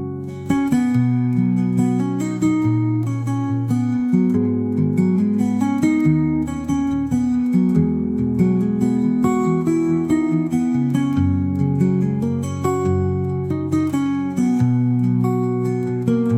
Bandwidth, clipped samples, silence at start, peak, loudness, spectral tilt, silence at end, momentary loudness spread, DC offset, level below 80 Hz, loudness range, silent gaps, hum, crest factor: 13.5 kHz; under 0.1%; 0 s; -4 dBFS; -19 LUFS; -8.5 dB/octave; 0 s; 4 LU; 0.1%; -48 dBFS; 1 LU; none; none; 14 dB